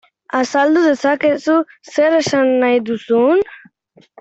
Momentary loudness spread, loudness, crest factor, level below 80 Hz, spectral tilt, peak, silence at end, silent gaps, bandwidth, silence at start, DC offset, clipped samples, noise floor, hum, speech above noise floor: 6 LU; -15 LUFS; 12 dB; -62 dBFS; -4.5 dB/octave; -2 dBFS; 0.65 s; none; 8.2 kHz; 0.35 s; under 0.1%; under 0.1%; -52 dBFS; none; 38 dB